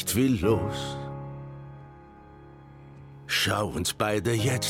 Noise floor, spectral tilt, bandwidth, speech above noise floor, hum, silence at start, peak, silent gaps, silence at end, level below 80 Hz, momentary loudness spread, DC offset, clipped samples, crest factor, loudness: -49 dBFS; -4.5 dB/octave; 17 kHz; 23 dB; none; 0 s; -8 dBFS; none; 0 s; -52 dBFS; 24 LU; under 0.1%; under 0.1%; 20 dB; -27 LUFS